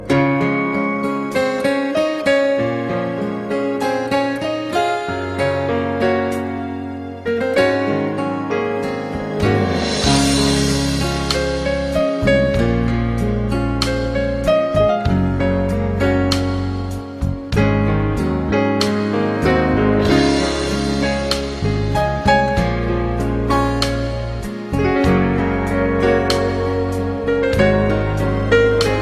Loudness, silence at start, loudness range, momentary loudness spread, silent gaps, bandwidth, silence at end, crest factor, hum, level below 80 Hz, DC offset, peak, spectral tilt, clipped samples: -18 LUFS; 0 s; 3 LU; 7 LU; none; 14 kHz; 0 s; 14 dB; none; -30 dBFS; under 0.1%; -2 dBFS; -6 dB/octave; under 0.1%